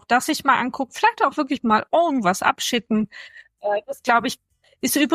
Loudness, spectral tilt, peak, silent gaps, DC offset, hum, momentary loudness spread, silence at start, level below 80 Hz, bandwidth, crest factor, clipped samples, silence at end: -21 LUFS; -3.5 dB/octave; -4 dBFS; none; under 0.1%; none; 9 LU; 0.1 s; -62 dBFS; 15.5 kHz; 16 dB; under 0.1%; 0 s